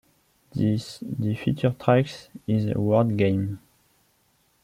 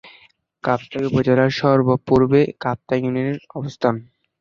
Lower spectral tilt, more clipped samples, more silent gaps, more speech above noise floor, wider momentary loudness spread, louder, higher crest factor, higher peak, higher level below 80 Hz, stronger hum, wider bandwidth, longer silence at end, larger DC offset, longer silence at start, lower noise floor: about the same, -8 dB/octave vs -8 dB/octave; neither; neither; first, 42 dB vs 35 dB; about the same, 12 LU vs 10 LU; second, -25 LUFS vs -19 LUFS; about the same, 20 dB vs 18 dB; about the same, -4 dBFS vs -2 dBFS; about the same, -56 dBFS vs -52 dBFS; neither; first, 14.5 kHz vs 7.2 kHz; first, 1.05 s vs 0.35 s; neither; first, 0.55 s vs 0.05 s; first, -66 dBFS vs -53 dBFS